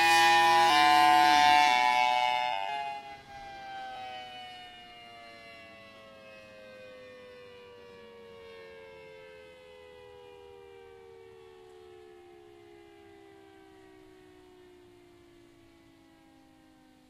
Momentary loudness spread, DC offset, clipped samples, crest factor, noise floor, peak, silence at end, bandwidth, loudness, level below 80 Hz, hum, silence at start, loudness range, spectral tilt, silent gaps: 29 LU; under 0.1%; under 0.1%; 20 dB; -59 dBFS; -10 dBFS; 8.45 s; 16 kHz; -23 LUFS; -70 dBFS; none; 0 s; 28 LU; -1.5 dB/octave; none